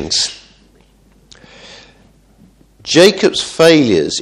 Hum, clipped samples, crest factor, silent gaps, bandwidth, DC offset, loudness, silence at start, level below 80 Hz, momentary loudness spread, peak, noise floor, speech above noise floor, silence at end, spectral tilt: none; 0.2%; 16 dB; none; 14.5 kHz; under 0.1%; -11 LUFS; 0 s; -48 dBFS; 8 LU; 0 dBFS; -49 dBFS; 38 dB; 0 s; -3.5 dB/octave